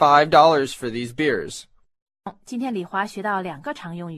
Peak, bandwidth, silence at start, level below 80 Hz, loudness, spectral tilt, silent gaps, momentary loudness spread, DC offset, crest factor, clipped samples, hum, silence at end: -2 dBFS; 13.5 kHz; 0 s; -60 dBFS; -21 LUFS; -5 dB/octave; 2.02-2.06 s; 22 LU; under 0.1%; 20 dB; under 0.1%; none; 0 s